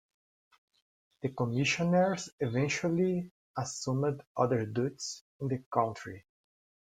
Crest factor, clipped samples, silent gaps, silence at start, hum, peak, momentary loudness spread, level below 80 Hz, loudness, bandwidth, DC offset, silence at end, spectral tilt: 20 dB; under 0.1%; 2.32-2.38 s, 3.31-3.54 s, 4.27-4.35 s, 5.21-5.39 s, 5.66-5.71 s; 1.25 s; none; -12 dBFS; 12 LU; -70 dBFS; -32 LUFS; 9.6 kHz; under 0.1%; 0.65 s; -5.5 dB/octave